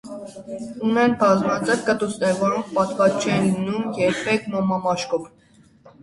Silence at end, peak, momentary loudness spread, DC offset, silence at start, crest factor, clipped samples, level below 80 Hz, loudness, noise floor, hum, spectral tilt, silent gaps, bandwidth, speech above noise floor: 0.15 s; -4 dBFS; 10 LU; under 0.1%; 0.05 s; 18 dB; under 0.1%; -58 dBFS; -21 LUFS; -51 dBFS; none; -5.5 dB/octave; none; 11.5 kHz; 30 dB